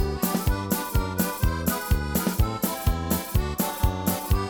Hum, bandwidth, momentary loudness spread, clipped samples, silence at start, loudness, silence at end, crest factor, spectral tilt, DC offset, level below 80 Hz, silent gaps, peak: none; over 20 kHz; 2 LU; under 0.1%; 0 s; -26 LUFS; 0 s; 16 dB; -5 dB/octave; under 0.1%; -30 dBFS; none; -10 dBFS